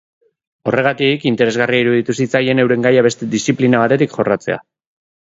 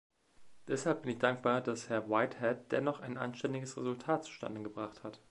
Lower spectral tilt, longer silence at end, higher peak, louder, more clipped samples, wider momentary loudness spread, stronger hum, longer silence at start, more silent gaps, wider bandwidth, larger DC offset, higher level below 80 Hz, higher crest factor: about the same, -5.5 dB/octave vs -5.5 dB/octave; first, 0.6 s vs 0.15 s; first, 0 dBFS vs -14 dBFS; first, -15 LUFS vs -36 LUFS; neither; second, 6 LU vs 10 LU; neither; first, 0.65 s vs 0.4 s; neither; second, 8 kHz vs 11.5 kHz; neither; first, -56 dBFS vs -76 dBFS; second, 16 dB vs 22 dB